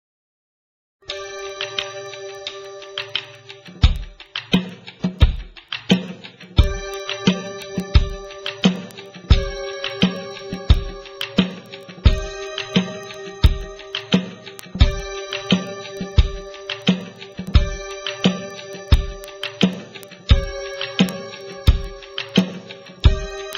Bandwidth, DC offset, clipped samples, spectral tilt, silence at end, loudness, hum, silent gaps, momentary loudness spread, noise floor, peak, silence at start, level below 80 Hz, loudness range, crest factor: 15.5 kHz; under 0.1%; under 0.1%; -5.5 dB/octave; 0 s; -22 LUFS; none; none; 14 LU; -40 dBFS; 0 dBFS; 1.1 s; -24 dBFS; 3 LU; 22 dB